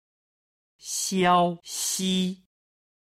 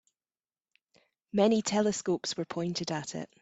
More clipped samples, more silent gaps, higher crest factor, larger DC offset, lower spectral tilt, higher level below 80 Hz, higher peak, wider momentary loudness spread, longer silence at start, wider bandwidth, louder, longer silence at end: neither; neither; about the same, 20 dB vs 20 dB; neither; about the same, -3.5 dB/octave vs -4.5 dB/octave; about the same, -68 dBFS vs -72 dBFS; first, -8 dBFS vs -12 dBFS; first, 13 LU vs 9 LU; second, 0.85 s vs 1.35 s; first, 16 kHz vs 8.4 kHz; first, -25 LUFS vs -30 LUFS; first, 0.85 s vs 0.15 s